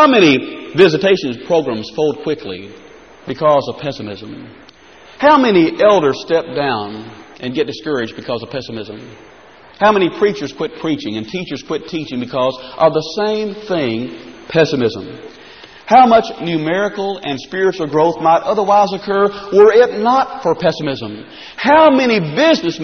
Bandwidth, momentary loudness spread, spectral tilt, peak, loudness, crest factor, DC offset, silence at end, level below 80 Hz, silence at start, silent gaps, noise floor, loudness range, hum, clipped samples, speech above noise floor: 6.6 kHz; 18 LU; -3.5 dB/octave; 0 dBFS; -15 LUFS; 14 dB; 0.2%; 0 s; -52 dBFS; 0 s; none; -42 dBFS; 7 LU; none; under 0.1%; 27 dB